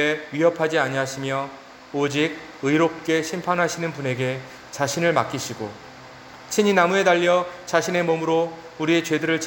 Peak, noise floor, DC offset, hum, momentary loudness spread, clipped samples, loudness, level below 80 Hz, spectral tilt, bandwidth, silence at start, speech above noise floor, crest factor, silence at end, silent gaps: -4 dBFS; -42 dBFS; under 0.1%; none; 16 LU; under 0.1%; -22 LUFS; -64 dBFS; -4.5 dB/octave; 17 kHz; 0 s; 20 dB; 18 dB; 0 s; none